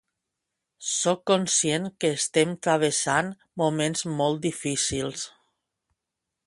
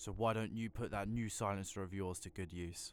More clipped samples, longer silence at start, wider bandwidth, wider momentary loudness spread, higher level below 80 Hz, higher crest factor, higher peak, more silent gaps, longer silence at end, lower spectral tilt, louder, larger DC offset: neither; first, 0.8 s vs 0 s; second, 11.5 kHz vs 18.5 kHz; about the same, 8 LU vs 8 LU; about the same, -60 dBFS vs -58 dBFS; about the same, 20 dB vs 18 dB; first, -6 dBFS vs -24 dBFS; neither; first, 1.2 s vs 0 s; second, -3.5 dB/octave vs -5 dB/octave; first, -25 LUFS vs -42 LUFS; neither